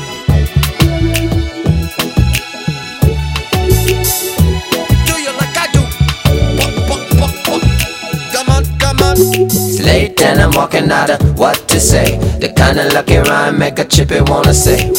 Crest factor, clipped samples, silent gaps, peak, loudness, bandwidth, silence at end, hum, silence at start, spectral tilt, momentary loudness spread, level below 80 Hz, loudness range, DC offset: 12 dB; 0.3%; none; 0 dBFS; -12 LUFS; 18 kHz; 0 s; none; 0 s; -4.5 dB/octave; 6 LU; -18 dBFS; 4 LU; under 0.1%